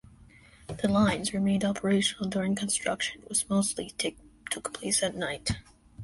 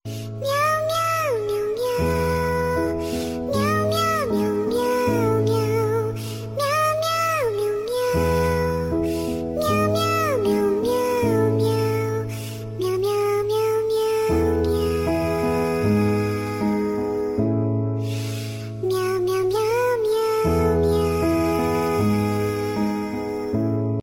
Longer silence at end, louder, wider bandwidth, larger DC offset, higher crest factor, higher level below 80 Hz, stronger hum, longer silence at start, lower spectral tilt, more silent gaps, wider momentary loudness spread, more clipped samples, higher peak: about the same, 0 s vs 0 s; second, -29 LUFS vs -22 LUFS; second, 11.5 kHz vs 16.5 kHz; neither; about the same, 16 dB vs 12 dB; second, -52 dBFS vs -40 dBFS; neither; first, 0.2 s vs 0.05 s; second, -3.5 dB/octave vs -6 dB/octave; neither; first, 9 LU vs 6 LU; neither; about the same, -12 dBFS vs -10 dBFS